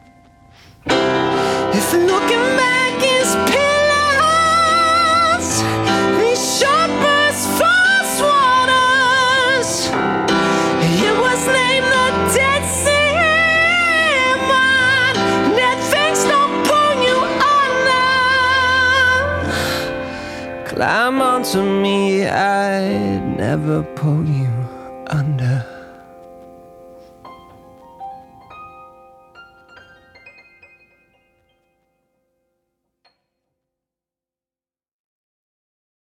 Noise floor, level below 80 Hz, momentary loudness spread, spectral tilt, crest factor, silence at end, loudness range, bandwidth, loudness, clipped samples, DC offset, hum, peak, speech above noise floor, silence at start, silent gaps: under -90 dBFS; -48 dBFS; 8 LU; -3.5 dB/octave; 14 dB; 5.85 s; 7 LU; 17.5 kHz; -14 LUFS; under 0.1%; under 0.1%; none; -2 dBFS; over 74 dB; 0.85 s; none